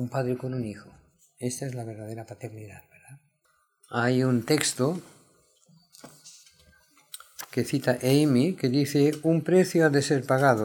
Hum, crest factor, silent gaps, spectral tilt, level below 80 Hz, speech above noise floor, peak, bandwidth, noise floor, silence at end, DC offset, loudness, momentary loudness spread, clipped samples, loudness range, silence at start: none; 22 dB; none; -5.5 dB/octave; -68 dBFS; 45 dB; -6 dBFS; 19.5 kHz; -70 dBFS; 0 s; under 0.1%; -25 LUFS; 19 LU; under 0.1%; 12 LU; 0 s